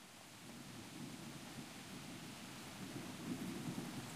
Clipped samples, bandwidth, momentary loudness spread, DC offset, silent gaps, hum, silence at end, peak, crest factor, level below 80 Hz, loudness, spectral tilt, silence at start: under 0.1%; 15.5 kHz; 7 LU; under 0.1%; none; none; 0 s; -32 dBFS; 18 dB; -74 dBFS; -50 LUFS; -4 dB/octave; 0 s